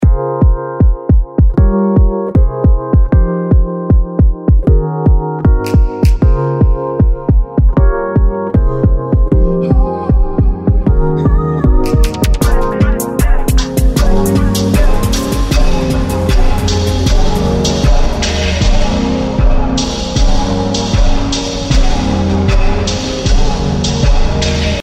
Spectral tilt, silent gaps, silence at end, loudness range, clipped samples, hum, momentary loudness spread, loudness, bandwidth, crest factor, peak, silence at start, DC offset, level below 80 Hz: -6 dB/octave; none; 0 s; 2 LU; under 0.1%; none; 3 LU; -13 LUFS; 15 kHz; 10 dB; 0 dBFS; 0 s; under 0.1%; -12 dBFS